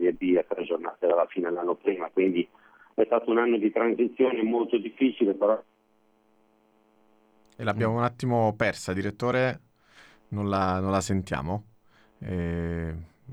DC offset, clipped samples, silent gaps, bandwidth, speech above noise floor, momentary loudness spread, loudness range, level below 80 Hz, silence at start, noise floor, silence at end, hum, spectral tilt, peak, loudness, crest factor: under 0.1%; under 0.1%; none; 12 kHz; 39 dB; 10 LU; 5 LU; -54 dBFS; 0 s; -65 dBFS; 0 s; none; -6.5 dB/octave; -10 dBFS; -27 LUFS; 18 dB